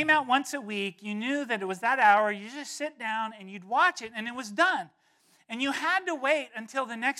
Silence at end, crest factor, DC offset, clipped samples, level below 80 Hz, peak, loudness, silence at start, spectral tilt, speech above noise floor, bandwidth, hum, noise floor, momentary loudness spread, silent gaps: 0 s; 18 dB; under 0.1%; under 0.1%; -82 dBFS; -10 dBFS; -28 LUFS; 0 s; -3 dB/octave; 35 dB; 14.5 kHz; none; -64 dBFS; 13 LU; none